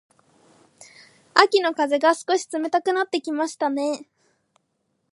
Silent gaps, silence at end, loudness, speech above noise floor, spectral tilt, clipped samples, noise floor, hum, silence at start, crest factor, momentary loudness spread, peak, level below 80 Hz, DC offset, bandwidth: none; 1.1 s; -22 LUFS; 52 dB; -1.5 dB/octave; under 0.1%; -73 dBFS; none; 1.35 s; 24 dB; 9 LU; 0 dBFS; -78 dBFS; under 0.1%; 11.5 kHz